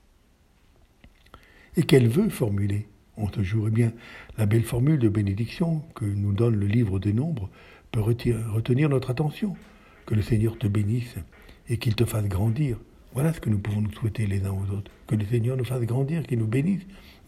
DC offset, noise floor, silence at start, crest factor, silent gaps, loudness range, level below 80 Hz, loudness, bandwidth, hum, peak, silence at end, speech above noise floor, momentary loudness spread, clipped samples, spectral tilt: under 0.1%; -60 dBFS; 1.05 s; 22 dB; none; 3 LU; -48 dBFS; -26 LUFS; 14.5 kHz; none; -4 dBFS; 0.15 s; 36 dB; 10 LU; under 0.1%; -7.5 dB/octave